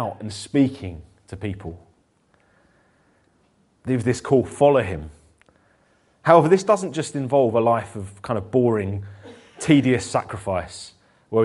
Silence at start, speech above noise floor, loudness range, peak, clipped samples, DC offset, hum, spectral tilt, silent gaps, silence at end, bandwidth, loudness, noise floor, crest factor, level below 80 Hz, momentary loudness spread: 0 s; 42 dB; 9 LU; 0 dBFS; under 0.1%; under 0.1%; none; -6.5 dB/octave; none; 0 s; 11.5 kHz; -21 LUFS; -62 dBFS; 22 dB; -52 dBFS; 19 LU